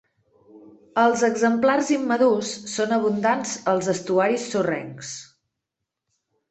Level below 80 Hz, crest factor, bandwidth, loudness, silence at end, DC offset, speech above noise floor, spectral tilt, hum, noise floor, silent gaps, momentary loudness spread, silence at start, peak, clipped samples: -68 dBFS; 18 dB; 8.4 kHz; -22 LUFS; 1.25 s; under 0.1%; 62 dB; -4.5 dB/octave; none; -83 dBFS; none; 10 LU; 0.55 s; -4 dBFS; under 0.1%